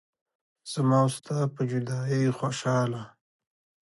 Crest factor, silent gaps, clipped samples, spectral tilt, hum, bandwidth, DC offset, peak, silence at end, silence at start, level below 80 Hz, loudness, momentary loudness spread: 16 dB; none; under 0.1%; -6.5 dB/octave; none; 11.5 kHz; under 0.1%; -12 dBFS; 0.8 s; 0.65 s; -70 dBFS; -27 LUFS; 14 LU